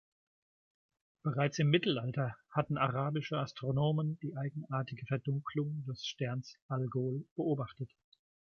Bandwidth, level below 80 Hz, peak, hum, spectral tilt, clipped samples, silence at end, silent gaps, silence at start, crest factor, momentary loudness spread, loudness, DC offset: 6.8 kHz; -68 dBFS; -16 dBFS; none; -6.5 dB/octave; under 0.1%; 0.75 s; 6.62-6.69 s, 7.31-7.36 s; 1.25 s; 20 dB; 9 LU; -36 LUFS; under 0.1%